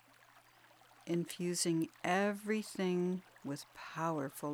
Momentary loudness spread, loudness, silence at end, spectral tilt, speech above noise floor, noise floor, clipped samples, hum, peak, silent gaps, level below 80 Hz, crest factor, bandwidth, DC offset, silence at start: 11 LU; -37 LUFS; 0 s; -4.5 dB/octave; 27 dB; -64 dBFS; under 0.1%; none; -18 dBFS; none; -82 dBFS; 20 dB; over 20 kHz; under 0.1%; 0.35 s